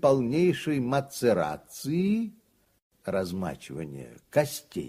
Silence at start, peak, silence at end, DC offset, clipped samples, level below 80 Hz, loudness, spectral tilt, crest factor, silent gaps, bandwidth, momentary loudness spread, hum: 0 s; -10 dBFS; 0 s; under 0.1%; under 0.1%; -60 dBFS; -28 LUFS; -6 dB/octave; 18 dB; 2.82-2.90 s; 15.5 kHz; 13 LU; none